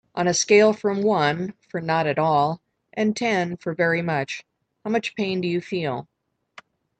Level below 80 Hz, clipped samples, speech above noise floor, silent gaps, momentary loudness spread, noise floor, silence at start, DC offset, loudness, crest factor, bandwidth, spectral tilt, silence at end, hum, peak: -66 dBFS; under 0.1%; 29 dB; none; 14 LU; -50 dBFS; 0.15 s; under 0.1%; -22 LUFS; 18 dB; 9 kHz; -4.5 dB/octave; 0.95 s; none; -4 dBFS